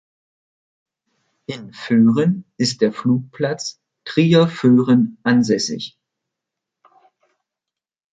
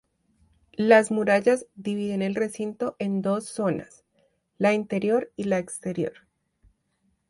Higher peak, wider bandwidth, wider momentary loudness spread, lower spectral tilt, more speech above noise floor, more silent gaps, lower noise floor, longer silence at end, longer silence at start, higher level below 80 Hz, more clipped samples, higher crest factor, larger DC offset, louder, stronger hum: first, -2 dBFS vs -6 dBFS; second, 9.2 kHz vs 11.5 kHz; first, 18 LU vs 12 LU; about the same, -6 dB/octave vs -6 dB/octave; first, 70 dB vs 47 dB; neither; first, -87 dBFS vs -71 dBFS; first, 2.25 s vs 1.2 s; first, 1.5 s vs 0.8 s; about the same, -62 dBFS vs -66 dBFS; neither; about the same, 18 dB vs 20 dB; neither; first, -17 LUFS vs -25 LUFS; neither